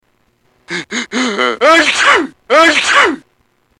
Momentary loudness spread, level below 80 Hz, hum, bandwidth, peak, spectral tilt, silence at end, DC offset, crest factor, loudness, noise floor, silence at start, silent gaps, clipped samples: 13 LU; -54 dBFS; none; 16.5 kHz; 0 dBFS; -1.5 dB/octave; 0.6 s; under 0.1%; 12 dB; -10 LUFS; -58 dBFS; 0.7 s; none; under 0.1%